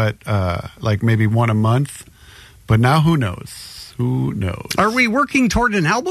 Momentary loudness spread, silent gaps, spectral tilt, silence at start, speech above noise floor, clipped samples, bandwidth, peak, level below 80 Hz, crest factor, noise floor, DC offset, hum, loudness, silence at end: 11 LU; none; -6 dB/octave; 0 s; 26 dB; under 0.1%; 13.5 kHz; -4 dBFS; -38 dBFS; 14 dB; -43 dBFS; under 0.1%; none; -17 LUFS; 0 s